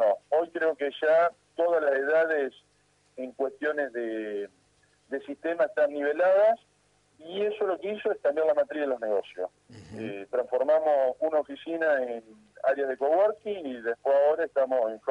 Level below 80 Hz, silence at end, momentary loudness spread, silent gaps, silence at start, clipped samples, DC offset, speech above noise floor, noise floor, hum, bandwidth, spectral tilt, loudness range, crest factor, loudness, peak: -76 dBFS; 0 s; 14 LU; none; 0 s; under 0.1%; under 0.1%; 40 dB; -67 dBFS; 50 Hz at -70 dBFS; 8 kHz; -5.5 dB/octave; 4 LU; 12 dB; -27 LUFS; -14 dBFS